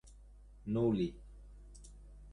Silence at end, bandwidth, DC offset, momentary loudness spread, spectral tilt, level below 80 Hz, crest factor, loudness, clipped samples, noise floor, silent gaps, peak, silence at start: 0 s; 11 kHz; under 0.1%; 25 LU; -8 dB/octave; -54 dBFS; 18 dB; -35 LUFS; under 0.1%; -57 dBFS; none; -22 dBFS; 0.05 s